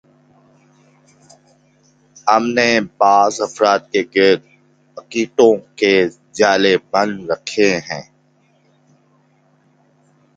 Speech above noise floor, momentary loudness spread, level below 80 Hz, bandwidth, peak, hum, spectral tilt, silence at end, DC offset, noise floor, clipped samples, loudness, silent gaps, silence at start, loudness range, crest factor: 42 dB; 9 LU; -60 dBFS; 9.2 kHz; 0 dBFS; none; -4 dB/octave; 2.35 s; under 0.1%; -57 dBFS; under 0.1%; -15 LUFS; none; 2.25 s; 5 LU; 18 dB